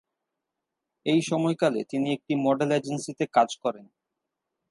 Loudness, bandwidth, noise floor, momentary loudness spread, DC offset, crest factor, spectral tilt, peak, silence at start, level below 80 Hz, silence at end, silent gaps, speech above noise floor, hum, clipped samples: -26 LUFS; 11.5 kHz; -85 dBFS; 9 LU; under 0.1%; 20 dB; -5.5 dB/octave; -8 dBFS; 1.05 s; -78 dBFS; 0.85 s; none; 59 dB; none; under 0.1%